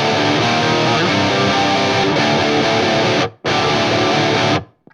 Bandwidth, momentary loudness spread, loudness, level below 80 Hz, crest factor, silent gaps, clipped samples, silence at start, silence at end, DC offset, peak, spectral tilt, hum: 11.5 kHz; 2 LU; -15 LUFS; -48 dBFS; 12 dB; none; under 0.1%; 0 s; 0.3 s; under 0.1%; -2 dBFS; -4.5 dB/octave; none